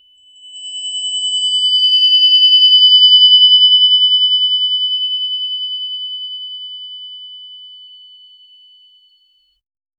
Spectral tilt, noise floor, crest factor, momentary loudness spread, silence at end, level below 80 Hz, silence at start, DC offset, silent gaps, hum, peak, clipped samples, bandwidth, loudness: 8.5 dB/octave; -57 dBFS; 14 dB; 22 LU; 2.3 s; -76 dBFS; 0.45 s; under 0.1%; none; none; 0 dBFS; under 0.1%; 8.6 kHz; -8 LUFS